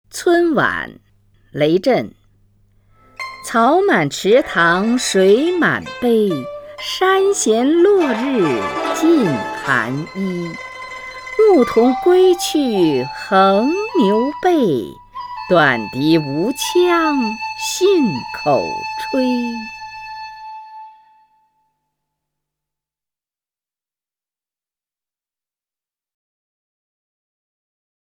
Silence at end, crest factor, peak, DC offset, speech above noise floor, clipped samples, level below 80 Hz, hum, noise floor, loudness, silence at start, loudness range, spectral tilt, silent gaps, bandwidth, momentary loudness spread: 7.2 s; 16 dB; -2 dBFS; under 0.1%; over 75 dB; under 0.1%; -54 dBFS; none; under -90 dBFS; -16 LUFS; 0.15 s; 6 LU; -4.5 dB/octave; none; 19.5 kHz; 17 LU